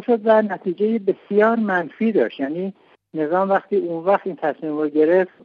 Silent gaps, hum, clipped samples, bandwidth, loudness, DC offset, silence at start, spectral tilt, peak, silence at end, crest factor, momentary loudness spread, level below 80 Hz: none; none; under 0.1%; 5.2 kHz; -20 LUFS; under 0.1%; 0 s; -9 dB/octave; -4 dBFS; 0.15 s; 16 dB; 9 LU; -76 dBFS